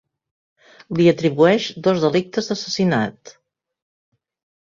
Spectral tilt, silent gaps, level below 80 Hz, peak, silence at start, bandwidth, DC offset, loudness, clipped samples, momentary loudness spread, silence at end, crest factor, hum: -6 dB/octave; none; -60 dBFS; -2 dBFS; 0.9 s; 7.6 kHz; under 0.1%; -19 LUFS; under 0.1%; 8 LU; 1.35 s; 18 dB; none